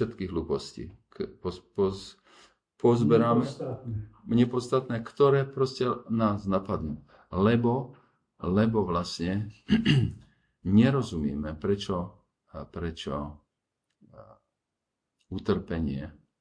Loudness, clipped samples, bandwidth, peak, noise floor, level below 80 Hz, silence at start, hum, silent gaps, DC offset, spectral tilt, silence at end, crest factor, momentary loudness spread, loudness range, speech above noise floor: -28 LUFS; under 0.1%; 10.5 kHz; -10 dBFS; -85 dBFS; -50 dBFS; 0 s; none; none; under 0.1%; -7.5 dB/octave; 0.3 s; 20 dB; 17 LU; 10 LU; 58 dB